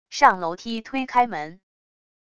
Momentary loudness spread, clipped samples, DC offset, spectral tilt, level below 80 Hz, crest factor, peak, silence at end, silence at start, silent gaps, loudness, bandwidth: 14 LU; under 0.1%; 0.5%; -3.5 dB/octave; -62 dBFS; 22 dB; -2 dBFS; 0.8 s; 0.1 s; none; -22 LUFS; 11 kHz